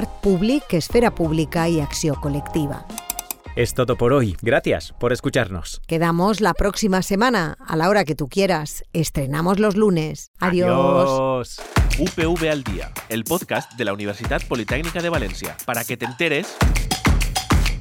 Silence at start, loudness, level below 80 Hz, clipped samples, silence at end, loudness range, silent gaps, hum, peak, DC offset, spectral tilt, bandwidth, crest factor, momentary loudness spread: 0 s; -21 LUFS; -30 dBFS; under 0.1%; 0 s; 4 LU; 10.27-10.34 s; none; -6 dBFS; under 0.1%; -5 dB/octave; over 20 kHz; 14 dB; 9 LU